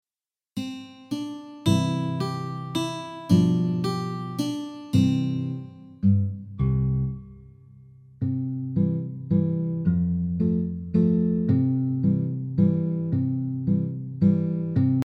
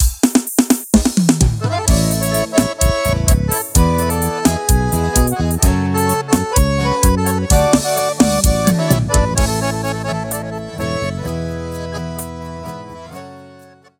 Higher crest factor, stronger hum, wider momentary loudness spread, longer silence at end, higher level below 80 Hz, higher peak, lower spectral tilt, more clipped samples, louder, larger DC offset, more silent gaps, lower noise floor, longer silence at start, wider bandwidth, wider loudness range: about the same, 18 dB vs 16 dB; neither; about the same, 11 LU vs 12 LU; second, 0.05 s vs 0.45 s; second, -46 dBFS vs -22 dBFS; second, -8 dBFS vs 0 dBFS; first, -8 dB/octave vs -5 dB/octave; neither; second, -25 LUFS vs -16 LUFS; neither; neither; first, under -90 dBFS vs -43 dBFS; first, 0.55 s vs 0 s; second, 13 kHz vs 19 kHz; second, 4 LU vs 9 LU